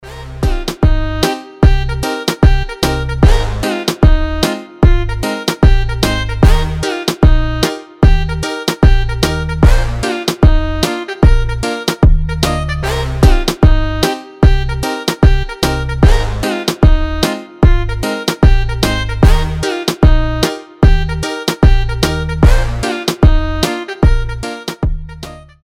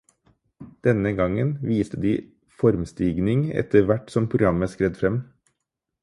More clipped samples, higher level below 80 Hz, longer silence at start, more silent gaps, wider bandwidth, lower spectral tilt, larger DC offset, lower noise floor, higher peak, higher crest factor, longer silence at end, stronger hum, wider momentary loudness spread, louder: first, 0.5% vs under 0.1%; first, -14 dBFS vs -46 dBFS; second, 0.05 s vs 0.6 s; neither; first, 15.5 kHz vs 11.5 kHz; second, -5.5 dB/octave vs -8.5 dB/octave; neither; second, -31 dBFS vs -81 dBFS; first, 0 dBFS vs -4 dBFS; second, 12 dB vs 20 dB; second, 0.25 s vs 0.8 s; neither; about the same, 6 LU vs 5 LU; first, -14 LUFS vs -23 LUFS